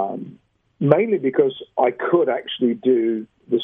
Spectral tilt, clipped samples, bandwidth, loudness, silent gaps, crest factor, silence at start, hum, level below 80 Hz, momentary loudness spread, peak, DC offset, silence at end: -10 dB/octave; under 0.1%; 3.8 kHz; -20 LUFS; none; 20 dB; 0 s; none; -70 dBFS; 10 LU; 0 dBFS; under 0.1%; 0 s